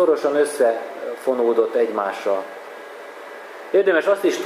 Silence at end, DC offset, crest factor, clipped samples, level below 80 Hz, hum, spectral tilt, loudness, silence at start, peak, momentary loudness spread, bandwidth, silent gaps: 0 s; under 0.1%; 16 dB; under 0.1%; -84 dBFS; none; -3.5 dB/octave; -20 LUFS; 0 s; -6 dBFS; 19 LU; 15.5 kHz; none